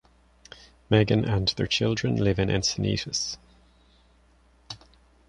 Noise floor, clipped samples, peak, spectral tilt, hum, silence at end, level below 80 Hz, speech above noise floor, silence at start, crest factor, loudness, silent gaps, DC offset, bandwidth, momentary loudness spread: -60 dBFS; under 0.1%; -6 dBFS; -5 dB/octave; none; 0.5 s; -46 dBFS; 35 dB; 0.9 s; 22 dB; -25 LUFS; none; under 0.1%; 10.5 kHz; 20 LU